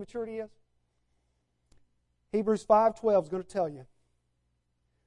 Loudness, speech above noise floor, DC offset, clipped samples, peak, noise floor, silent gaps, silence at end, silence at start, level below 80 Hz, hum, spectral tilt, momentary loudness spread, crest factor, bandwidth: -28 LUFS; 48 dB; under 0.1%; under 0.1%; -10 dBFS; -76 dBFS; none; 1.25 s; 0 s; -66 dBFS; 60 Hz at -65 dBFS; -7 dB/octave; 15 LU; 22 dB; 11 kHz